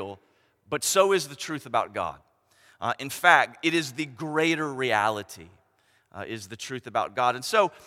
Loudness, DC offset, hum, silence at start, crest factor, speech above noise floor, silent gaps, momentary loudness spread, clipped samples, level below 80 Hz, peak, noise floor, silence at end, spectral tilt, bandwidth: -25 LUFS; under 0.1%; none; 0 s; 26 dB; 40 dB; none; 16 LU; under 0.1%; -70 dBFS; -2 dBFS; -66 dBFS; 0.15 s; -3 dB/octave; 16.5 kHz